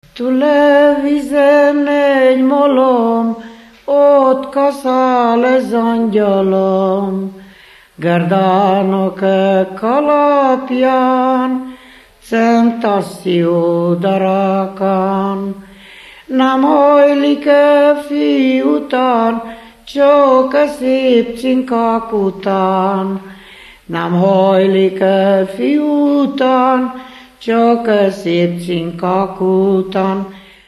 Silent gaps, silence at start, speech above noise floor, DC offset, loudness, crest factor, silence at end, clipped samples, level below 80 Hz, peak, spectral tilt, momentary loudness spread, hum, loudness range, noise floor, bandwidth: none; 0.15 s; 30 dB; under 0.1%; -12 LUFS; 12 dB; 0.3 s; under 0.1%; -52 dBFS; 0 dBFS; -7.5 dB/octave; 10 LU; none; 3 LU; -42 dBFS; 12.5 kHz